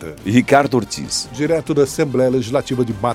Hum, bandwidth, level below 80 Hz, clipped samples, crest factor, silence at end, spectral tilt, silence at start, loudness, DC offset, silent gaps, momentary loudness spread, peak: none; 16 kHz; -46 dBFS; under 0.1%; 16 dB; 0 s; -5 dB/octave; 0 s; -17 LUFS; under 0.1%; none; 8 LU; 0 dBFS